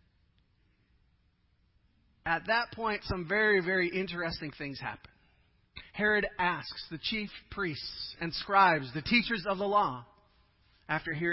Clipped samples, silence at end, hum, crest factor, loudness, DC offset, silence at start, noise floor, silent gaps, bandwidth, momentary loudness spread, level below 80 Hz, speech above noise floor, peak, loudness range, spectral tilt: under 0.1%; 0 s; none; 22 dB; -31 LUFS; under 0.1%; 2.25 s; -70 dBFS; none; 5.8 kHz; 14 LU; -56 dBFS; 39 dB; -10 dBFS; 4 LU; -8.5 dB/octave